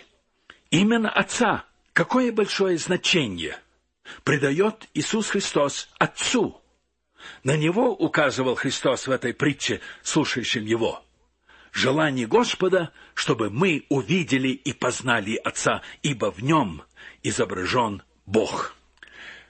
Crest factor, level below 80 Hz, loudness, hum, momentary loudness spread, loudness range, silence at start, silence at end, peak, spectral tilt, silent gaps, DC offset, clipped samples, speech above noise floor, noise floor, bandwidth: 20 dB; -58 dBFS; -23 LUFS; none; 9 LU; 2 LU; 0.7 s; 0.1 s; -4 dBFS; -4 dB/octave; none; under 0.1%; under 0.1%; 46 dB; -69 dBFS; 8.8 kHz